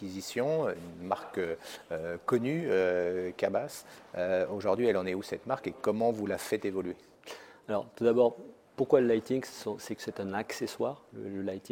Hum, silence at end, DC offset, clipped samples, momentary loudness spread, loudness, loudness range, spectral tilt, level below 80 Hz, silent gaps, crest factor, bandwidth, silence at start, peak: none; 0.05 s; under 0.1%; under 0.1%; 14 LU; -32 LUFS; 2 LU; -5.5 dB/octave; -70 dBFS; none; 22 dB; 17 kHz; 0 s; -10 dBFS